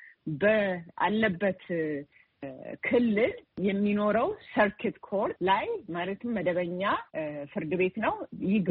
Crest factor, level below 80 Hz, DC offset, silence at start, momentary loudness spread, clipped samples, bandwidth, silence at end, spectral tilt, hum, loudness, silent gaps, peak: 18 dB; -62 dBFS; under 0.1%; 0 s; 10 LU; under 0.1%; 4.7 kHz; 0 s; -4.5 dB/octave; none; -29 LUFS; none; -12 dBFS